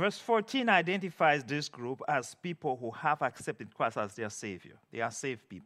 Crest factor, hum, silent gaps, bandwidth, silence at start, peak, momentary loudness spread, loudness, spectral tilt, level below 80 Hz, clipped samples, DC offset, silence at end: 24 dB; none; none; 14.5 kHz; 0 s; -10 dBFS; 13 LU; -32 LUFS; -4.5 dB/octave; -82 dBFS; under 0.1%; under 0.1%; 0.05 s